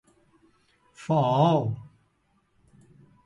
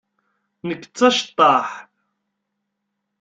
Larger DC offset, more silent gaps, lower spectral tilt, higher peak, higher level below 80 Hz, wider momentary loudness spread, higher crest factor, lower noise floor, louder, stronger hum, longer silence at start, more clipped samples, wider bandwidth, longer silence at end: neither; neither; first, -8 dB/octave vs -3.5 dB/octave; second, -10 dBFS vs -2 dBFS; first, -64 dBFS vs -70 dBFS; about the same, 18 LU vs 16 LU; about the same, 20 dB vs 20 dB; second, -69 dBFS vs -77 dBFS; second, -24 LUFS vs -17 LUFS; neither; first, 1 s vs 0.65 s; neither; first, 10.5 kHz vs 9 kHz; about the same, 1.45 s vs 1.4 s